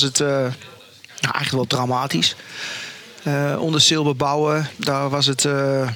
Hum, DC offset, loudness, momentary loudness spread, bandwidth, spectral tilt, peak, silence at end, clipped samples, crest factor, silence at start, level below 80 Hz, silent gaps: none; under 0.1%; -20 LUFS; 15 LU; 18.5 kHz; -3.5 dB/octave; -2 dBFS; 0 s; under 0.1%; 18 dB; 0 s; -64 dBFS; none